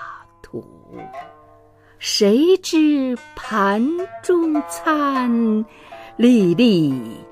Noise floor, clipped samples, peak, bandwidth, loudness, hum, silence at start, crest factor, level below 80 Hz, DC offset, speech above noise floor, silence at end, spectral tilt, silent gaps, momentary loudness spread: -50 dBFS; under 0.1%; -2 dBFS; 15.5 kHz; -18 LUFS; none; 0 s; 16 dB; -56 dBFS; under 0.1%; 32 dB; 0.05 s; -5 dB/octave; none; 21 LU